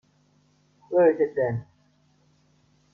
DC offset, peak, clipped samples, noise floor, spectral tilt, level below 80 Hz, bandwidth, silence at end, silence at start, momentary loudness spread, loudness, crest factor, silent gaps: under 0.1%; -8 dBFS; under 0.1%; -64 dBFS; -10 dB/octave; -66 dBFS; 3 kHz; 1.3 s; 0.9 s; 9 LU; -24 LUFS; 18 dB; none